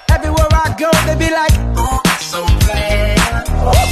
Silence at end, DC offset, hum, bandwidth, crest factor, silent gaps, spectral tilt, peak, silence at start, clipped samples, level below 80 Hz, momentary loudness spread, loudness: 0 s; under 0.1%; none; 14 kHz; 12 dB; none; -4.5 dB/octave; 0 dBFS; 0.1 s; under 0.1%; -16 dBFS; 3 LU; -14 LUFS